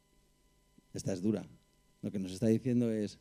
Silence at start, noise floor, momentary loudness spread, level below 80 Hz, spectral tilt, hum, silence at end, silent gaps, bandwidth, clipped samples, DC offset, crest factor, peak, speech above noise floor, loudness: 0.95 s; -70 dBFS; 14 LU; -68 dBFS; -7 dB/octave; none; 0.05 s; none; 15 kHz; under 0.1%; under 0.1%; 18 dB; -18 dBFS; 36 dB; -35 LUFS